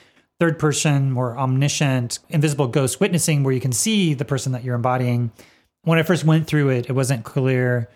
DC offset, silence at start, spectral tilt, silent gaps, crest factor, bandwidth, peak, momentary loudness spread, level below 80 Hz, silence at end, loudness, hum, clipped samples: under 0.1%; 0.4 s; -5.5 dB/octave; none; 16 dB; 16.5 kHz; -4 dBFS; 5 LU; -58 dBFS; 0.1 s; -20 LUFS; none; under 0.1%